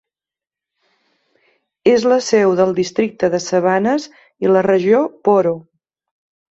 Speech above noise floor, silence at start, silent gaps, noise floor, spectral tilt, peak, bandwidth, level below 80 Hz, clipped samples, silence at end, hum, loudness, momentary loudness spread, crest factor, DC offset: 75 dB; 1.85 s; none; -89 dBFS; -5.5 dB/octave; -2 dBFS; 8 kHz; -60 dBFS; under 0.1%; 0.9 s; none; -15 LUFS; 7 LU; 16 dB; under 0.1%